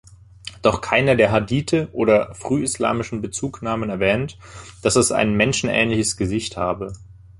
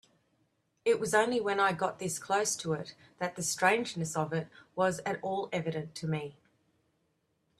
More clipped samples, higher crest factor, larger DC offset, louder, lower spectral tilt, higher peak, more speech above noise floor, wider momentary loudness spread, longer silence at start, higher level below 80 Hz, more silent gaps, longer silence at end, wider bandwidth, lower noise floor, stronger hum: neither; about the same, 20 dB vs 22 dB; neither; first, -20 LUFS vs -32 LUFS; about the same, -4.5 dB/octave vs -4 dB/octave; first, -2 dBFS vs -10 dBFS; second, 20 dB vs 45 dB; first, 13 LU vs 10 LU; second, 0.1 s vs 0.85 s; first, -44 dBFS vs -72 dBFS; neither; second, 0.25 s vs 1.25 s; second, 11.5 kHz vs 14 kHz; second, -40 dBFS vs -76 dBFS; neither